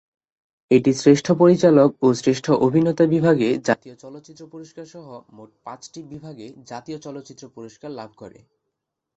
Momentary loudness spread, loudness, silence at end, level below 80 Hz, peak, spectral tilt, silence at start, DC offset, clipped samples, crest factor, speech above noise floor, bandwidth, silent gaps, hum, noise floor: 25 LU; -17 LUFS; 0.9 s; -62 dBFS; -2 dBFS; -6.5 dB/octave; 0.7 s; under 0.1%; under 0.1%; 18 dB; 60 dB; 8.2 kHz; none; none; -80 dBFS